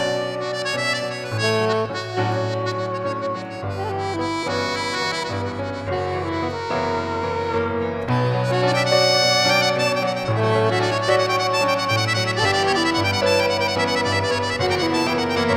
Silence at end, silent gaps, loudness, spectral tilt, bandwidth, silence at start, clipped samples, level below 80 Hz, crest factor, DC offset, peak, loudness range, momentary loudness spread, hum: 0 s; none; -21 LUFS; -4.5 dB/octave; 16.5 kHz; 0 s; under 0.1%; -54 dBFS; 16 dB; under 0.1%; -4 dBFS; 6 LU; 8 LU; none